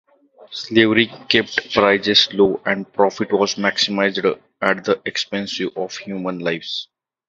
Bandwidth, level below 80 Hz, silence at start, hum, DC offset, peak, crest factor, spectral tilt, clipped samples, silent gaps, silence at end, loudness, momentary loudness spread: 7.8 kHz; -56 dBFS; 0.4 s; none; under 0.1%; 0 dBFS; 20 dB; -4 dB/octave; under 0.1%; none; 0.45 s; -18 LUFS; 12 LU